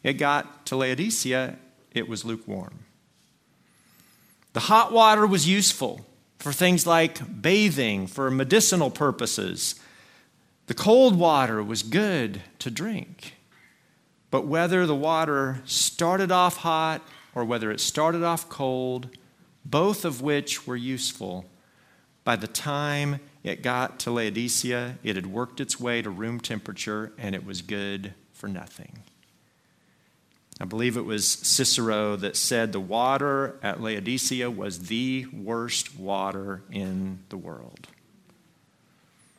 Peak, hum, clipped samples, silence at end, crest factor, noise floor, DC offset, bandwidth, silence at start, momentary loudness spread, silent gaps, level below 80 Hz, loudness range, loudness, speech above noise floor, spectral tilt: -4 dBFS; none; under 0.1%; 1.7 s; 22 dB; -64 dBFS; under 0.1%; 16 kHz; 0.05 s; 15 LU; none; -68 dBFS; 11 LU; -25 LUFS; 39 dB; -3.5 dB/octave